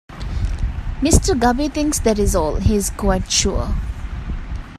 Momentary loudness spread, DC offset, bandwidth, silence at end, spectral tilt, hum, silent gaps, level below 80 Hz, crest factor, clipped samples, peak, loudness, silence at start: 13 LU; under 0.1%; 15 kHz; 0 s; -4.5 dB/octave; none; none; -24 dBFS; 18 dB; under 0.1%; 0 dBFS; -19 LUFS; 0.1 s